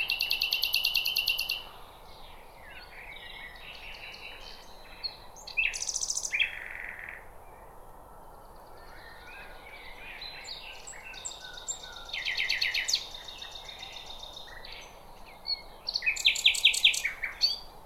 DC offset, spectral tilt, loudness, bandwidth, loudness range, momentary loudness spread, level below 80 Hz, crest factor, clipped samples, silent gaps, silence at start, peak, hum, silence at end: under 0.1%; 1.5 dB/octave; -28 LUFS; 17 kHz; 18 LU; 23 LU; -54 dBFS; 24 dB; under 0.1%; none; 0 s; -10 dBFS; none; 0 s